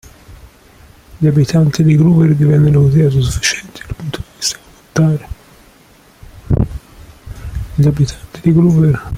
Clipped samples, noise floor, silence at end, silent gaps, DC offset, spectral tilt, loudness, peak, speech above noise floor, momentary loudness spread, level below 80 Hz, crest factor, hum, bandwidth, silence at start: under 0.1%; -46 dBFS; 0 s; none; under 0.1%; -6.5 dB/octave; -13 LUFS; 0 dBFS; 35 dB; 18 LU; -32 dBFS; 14 dB; none; 14.5 kHz; 0.3 s